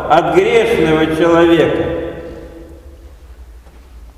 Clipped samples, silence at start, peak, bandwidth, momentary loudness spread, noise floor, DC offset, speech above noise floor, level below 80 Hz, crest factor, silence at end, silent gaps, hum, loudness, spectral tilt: under 0.1%; 0 s; 0 dBFS; 13.5 kHz; 21 LU; -38 dBFS; under 0.1%; 27 dB; -36 dBFS; 14 dB; 0.05 s; none; none; -12 LUFS; -6 dB/octave